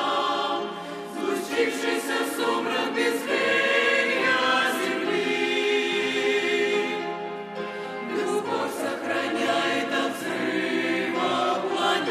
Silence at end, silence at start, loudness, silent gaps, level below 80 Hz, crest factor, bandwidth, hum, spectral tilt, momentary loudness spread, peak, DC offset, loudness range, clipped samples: 0 s; 0 s; -25 LUFS; none; -78 dBFS; 16 dB; 15.5 kHz; none; -3 dB/octave; 9 LU; -10 dBFS; under 0.1%; 5 LU; under 0.1%